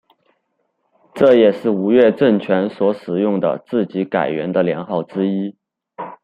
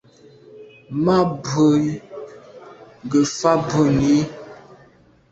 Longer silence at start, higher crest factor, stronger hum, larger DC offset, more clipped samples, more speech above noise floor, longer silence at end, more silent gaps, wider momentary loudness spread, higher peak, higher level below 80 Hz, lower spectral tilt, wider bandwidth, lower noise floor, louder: first, 1.15 s vs 0.55 s; about the same, 16 dB vs 18 dB; neither; neither; neither; first, 53 dB vs 35 dB; second, 0.1 s vs 0.75 s; neither; second, 11 LU vs 20 LU; about the same, -2 dBFS vs -4 dBFS; second, -62 dBFS vs -50 dBFS; first, -8.5 dB/octave vs -6 dB/octave; second, 5.4 kHz vs 8 kHz; first, -69 dBFS vs -52 dBFS; about the same, -17 LUFS vs -19 LUFS